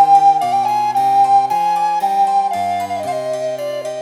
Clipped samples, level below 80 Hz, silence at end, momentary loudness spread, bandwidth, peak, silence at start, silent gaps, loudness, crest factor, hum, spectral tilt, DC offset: under 0.1%; -70 dBFS; 0 s; 10 LU; 15 kHz; -2 dBFS; 0 s; none; -15 LUFS; 12 dB; none; -4 dB/octave; under 0.1%